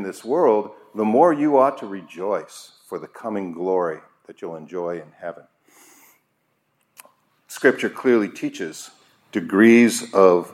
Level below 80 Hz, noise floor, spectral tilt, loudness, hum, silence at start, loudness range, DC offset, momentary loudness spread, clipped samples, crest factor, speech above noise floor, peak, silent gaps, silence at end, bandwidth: -76 dBFS; -69 dBFS; -5 dB/octave; -20 LUFS; none; 0 s; 15 LU; under 0.1%; 20 LU; under 0.1%; 20 dB; 50 dB; -2 dBFS; none; 0 s; 15.5 kHz